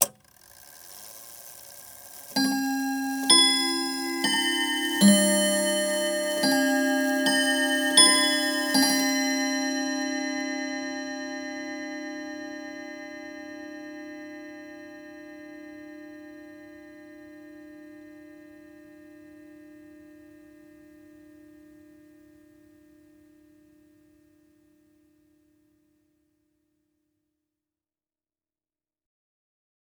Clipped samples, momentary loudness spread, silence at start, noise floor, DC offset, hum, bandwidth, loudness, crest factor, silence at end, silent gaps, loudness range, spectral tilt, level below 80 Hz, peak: under 0.1%; 26 LU; 0 s; under -90 dBFS; under 0.1%; none; over 20 kHz; -23 LUFS; 26 dB; 10.2 s; none; 23 LU; -2 dB/octave; -74 dBFS; -2 dBFS